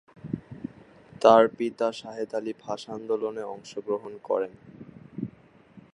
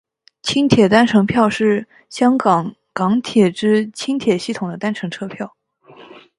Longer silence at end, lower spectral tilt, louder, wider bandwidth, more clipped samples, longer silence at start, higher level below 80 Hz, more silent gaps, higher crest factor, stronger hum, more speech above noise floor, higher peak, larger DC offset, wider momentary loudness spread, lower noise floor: about the same, 0.15 s vs 0.2 s; about the same, -6 dB/octave vs -5.5 dB/octave; second, -27 LUFS vs -17 LUFS; about the same, 11 kHz vs 11.5 kHz; neither; second, 0.25 s vs 0.45 s; second, -66 dBFS vs -54 dBFS; neither; first, 24 dB vs 18 dB; neither; about the same, 28 dB vs 29 dB; second, -4 dBFS vs 0 dBFS; neither; first, 22 LU vs 14 LU; first, -54 dBFS vs -45 dBFS